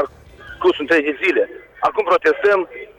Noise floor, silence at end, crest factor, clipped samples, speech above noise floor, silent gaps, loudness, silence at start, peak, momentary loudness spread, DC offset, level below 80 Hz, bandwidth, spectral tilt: -39 dBFS; 0.15 s; 12 dB; under 0.1%; 22 dB; none; -18 LUFS; 0 s; -6 dBFS; 7 LU; under 0.1%; -52 dBFS; 10.5 kHz; -4.5 dB/octave